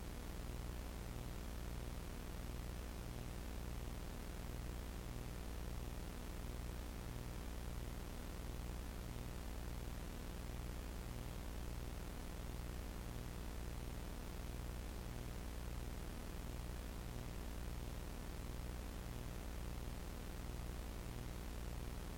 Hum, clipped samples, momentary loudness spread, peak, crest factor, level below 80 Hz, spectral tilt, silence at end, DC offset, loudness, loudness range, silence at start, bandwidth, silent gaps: 60 Hz at -50 dBFS; under 0.1%; 1 LU; -36 dBFS; 10 dB; -50 dBFS; -5 dB/octave; 0 s; under 0.1%; -50 LUFS; 0 LU; 0 s; 16.5 kHz; none